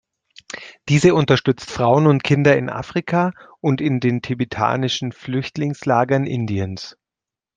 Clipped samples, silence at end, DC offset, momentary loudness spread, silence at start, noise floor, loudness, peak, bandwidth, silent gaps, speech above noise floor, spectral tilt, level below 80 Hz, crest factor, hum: under 0.1%; 0.65 s; under 0.1%; 11 LU; 0.55 s; -88 dBFS; -19 LUFS; -2 dBFS; 9.4 kHz; none; 70 dB; -6.5 dB/octave; -54 dBFS; 18 dB; none